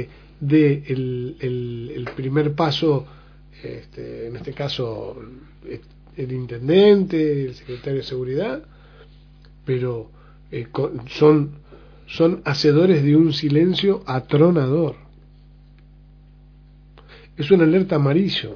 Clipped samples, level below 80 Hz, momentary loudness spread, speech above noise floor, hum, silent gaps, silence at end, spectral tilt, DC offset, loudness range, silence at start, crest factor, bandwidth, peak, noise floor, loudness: under 0.1%; -48 dBFS; 20 LU; 27 dB; 50 Hz at -45 dBFS; none; 0 s; -8 dB/octave; under 0.1%; 10 LU; 0 s; 18 dB; 5.4 kHz; -2 dBFS; -47 dBFS; -19 LUFS